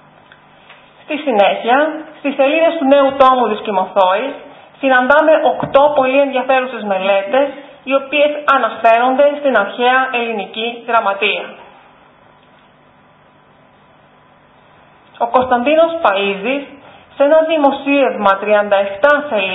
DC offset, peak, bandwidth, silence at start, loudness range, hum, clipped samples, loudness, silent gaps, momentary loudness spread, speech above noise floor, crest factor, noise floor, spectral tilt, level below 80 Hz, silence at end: under 0.1%; 0 dBFS; 4 kHz; 1.1 s; 8 LU; none; under 0.1%; -13 LUFS; none; 10 LU; 35 dB; 14 dB; -48 dBFS; -6.5 dB/octave; -56 dBFS; 0 s